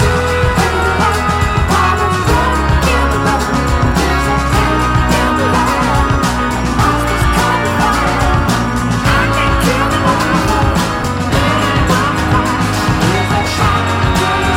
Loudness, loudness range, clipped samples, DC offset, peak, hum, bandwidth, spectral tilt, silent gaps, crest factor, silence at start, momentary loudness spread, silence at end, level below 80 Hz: -13 LUFS; 0 LU; under 0.1%; under 0.1%; -2 dBFS; none; 16.5 kHz; -5 dB/octave; none; 10 dB; 0 s; 2 LU; 0 s; -20 dBFS